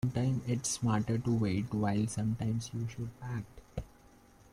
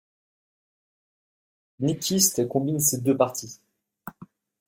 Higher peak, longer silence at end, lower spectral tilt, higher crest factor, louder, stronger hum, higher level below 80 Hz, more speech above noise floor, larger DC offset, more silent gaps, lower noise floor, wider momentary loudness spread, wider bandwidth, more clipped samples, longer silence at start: second, -20 dBFS vs -6 dBFS; first, 0.65 s vs 0.4 s; first, -6 dB/octave vs -4 dB/octave; second, 14 dB vs 22 dB; second, -34 LUFS vs -23 LUFS; neither; first, -56 dBFS vs -64 dBFS; about the same, 27 dB vs 27 dB; neither; neither; first, -60 dBFS vs -50 dBFS; second, 14 LU vs 23 LU; second, 13.5 kHz vs 16.5 kHz; neither; second, 0.05 s vs 1.8 s